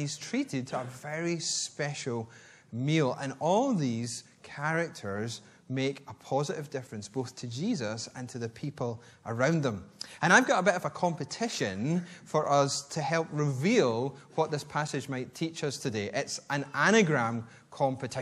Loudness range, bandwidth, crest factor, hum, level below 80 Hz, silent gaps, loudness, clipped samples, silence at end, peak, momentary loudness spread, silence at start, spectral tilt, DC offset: 7 LU; 14 kHz; 24 dB; none; -72 dBFS; none; -30 LUFS; under 0.1%; 0 s; -6 dBFS; 13 LU; 0 s; -4.5 dB/octave; under 0.1%